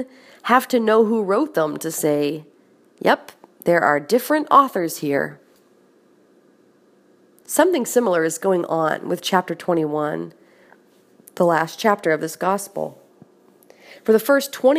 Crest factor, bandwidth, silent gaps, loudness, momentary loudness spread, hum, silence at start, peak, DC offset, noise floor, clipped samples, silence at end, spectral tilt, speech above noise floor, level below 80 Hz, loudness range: 20 dB; 15.5 kHz; none; -20 LUFS; 10 LU; none; 0 s; 0 dBFS; under 0.1%; -56 dBFS; under 0.1%; 0 s; -4.5 dB/octave; 37 dB; -74 dBFS; 4 LU